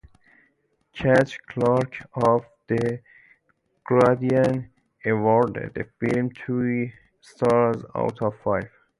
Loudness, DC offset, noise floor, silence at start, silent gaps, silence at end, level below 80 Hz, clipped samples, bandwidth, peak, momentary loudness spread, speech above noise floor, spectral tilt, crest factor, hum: -23 LUFS; under 0.1%; -69 dBFS; 0.95 s; none; 0.3 s; -56 dBFS; under 0.1%; 11.5 kHz; -6 dBFS; 11 LU; 47 dB; -8 dB/octave; 18 dB; none